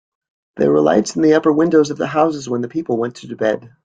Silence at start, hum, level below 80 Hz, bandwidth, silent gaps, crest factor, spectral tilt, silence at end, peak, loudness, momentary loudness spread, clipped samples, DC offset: 0.55 s; none; -58 dBFS; 9.2 kHz; none; 16 dB; -6 dB/octave; 0.2 s; -2 dBFS; -16 LUFS; 8 LU; under 0.1%; under 0.1%